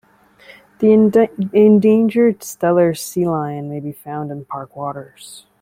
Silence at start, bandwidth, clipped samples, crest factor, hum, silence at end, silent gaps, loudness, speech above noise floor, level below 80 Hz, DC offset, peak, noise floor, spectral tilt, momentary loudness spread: 0.8 s; 16 kHz; under 0.1%; 14 dB; none; 0.2 s; none; -15 LUFS; 31 dB; -58 dBFS; under 0.1%; -2 dBFS; -47 dBFS; -7 dB/octave; 17 LU